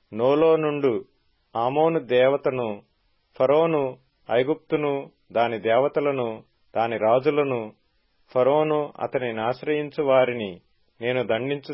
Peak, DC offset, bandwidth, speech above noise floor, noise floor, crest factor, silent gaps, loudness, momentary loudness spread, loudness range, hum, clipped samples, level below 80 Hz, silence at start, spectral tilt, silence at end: -8 dBFS; under 0.1%; 5.8 kHz; 44 dB; -66 dBFS; 16 dB; none; -23 LUFS; 11 LU; 2 LU; none; under 0.1%; -68 dBFS; 0.1 s; -10.5 dB/octave; 0 s